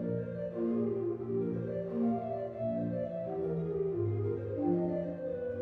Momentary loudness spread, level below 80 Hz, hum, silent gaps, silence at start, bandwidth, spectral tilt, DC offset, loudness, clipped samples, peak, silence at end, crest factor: 4 LU; -64 dBFS; none; none; 0 s; 4.5 kHz; -11.5 dB/octave; under 0.1%; -35 LUFS; under 0.1%; -20 dBFS; 0 s; 14 dB